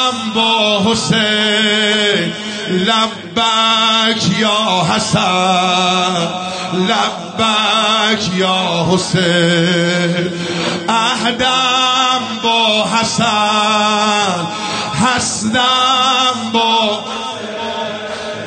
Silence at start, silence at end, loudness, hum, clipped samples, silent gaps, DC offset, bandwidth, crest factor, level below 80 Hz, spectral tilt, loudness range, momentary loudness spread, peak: 0 s; 0 s; -13 LUFS; none; under 0.1%; none; under 0.1%; 9.6 kHz; 12 dB; -50 dBFS; -3.5 dB/octave; 1 LU; 8 LU; -2 dBFS